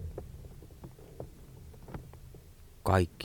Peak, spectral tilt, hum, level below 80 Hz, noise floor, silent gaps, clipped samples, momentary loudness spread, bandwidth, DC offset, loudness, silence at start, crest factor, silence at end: -12 dBFS; -6.5 dB/octave; none; -50 dBFS; -53 dBFS; none; under 0.1%; 24 LU; 18.5 kHz; under 0.1%; -35 LUFS; 0 s; 26 dB; 0 s